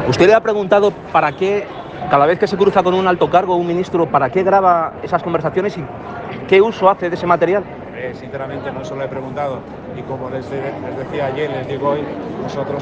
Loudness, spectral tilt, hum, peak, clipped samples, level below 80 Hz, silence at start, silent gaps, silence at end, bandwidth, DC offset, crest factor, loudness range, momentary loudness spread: -16 LUFS; -6.5 dB/octave; none; 0 dBFS; under 0.1%; -50 dBFS; 0 s; none; 0 s; 8 kHz; under 0.1%; 16 dB; 9 LU; 14 LU